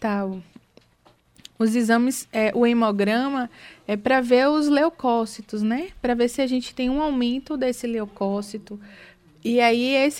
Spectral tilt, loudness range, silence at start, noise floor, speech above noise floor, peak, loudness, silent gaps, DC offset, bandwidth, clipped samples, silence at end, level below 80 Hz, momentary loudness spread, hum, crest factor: -5 dB/octave; 4 LU; 0 s; -59 dBFS; 37 dB; -6 dBFS; -22 LUFS; none; under 0.1%; 16 kHz; under 0.1%; 0 s; -52 dBFS; 12 LU; none; 16 dB